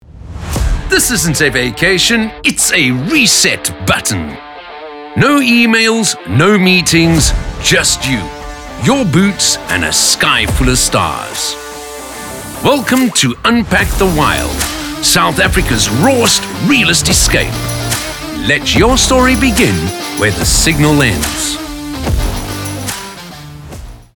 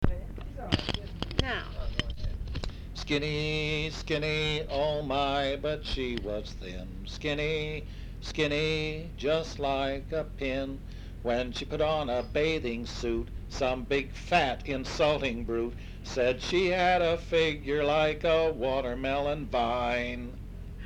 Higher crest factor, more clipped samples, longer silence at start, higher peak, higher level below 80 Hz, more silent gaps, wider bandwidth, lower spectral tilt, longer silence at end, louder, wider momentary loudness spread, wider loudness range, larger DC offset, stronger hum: second, 12 dB vs 24 dB; neither; about the same, 0.1 s vs 0 s; first, 0 dBFS vs -6 dBFS; first, -24 dBFS vs -40 dBFS; neither; first, over 20 kHz vs 12.5 kHz; second, -3 dB/octave vs -5.5 dB/octave; first, 0.15 s vs 0 s; first, -11 LUFS vs -30 LUFS; first, 16 LU vs 12 LU; about the same, 3 LU vs 5 LU; neither; neither